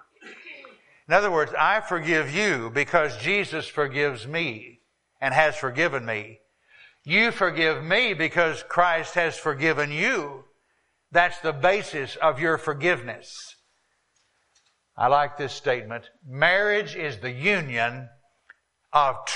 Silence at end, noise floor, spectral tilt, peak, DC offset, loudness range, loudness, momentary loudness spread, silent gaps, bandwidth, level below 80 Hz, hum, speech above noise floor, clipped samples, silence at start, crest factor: 0 s; -70 dBFS; -4 dB/octave; -2 dBFS; under 0.1%; 4 LU; -23 LUFS; 16 LU; none; 11 kHz; -60 dBFS; none; 46 dB; under 0.1%; 0.2 s; 22 dB